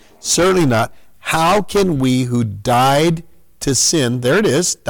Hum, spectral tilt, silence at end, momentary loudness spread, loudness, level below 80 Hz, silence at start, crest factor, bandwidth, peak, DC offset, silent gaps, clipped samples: none; -4 dB/octave; 0 s; 7 LU; -15 LUFS; -40 dBFS; 0.25 s; 10 dB; 19 kHz; -6 dBFS; under 0.1%; none; under 0.1%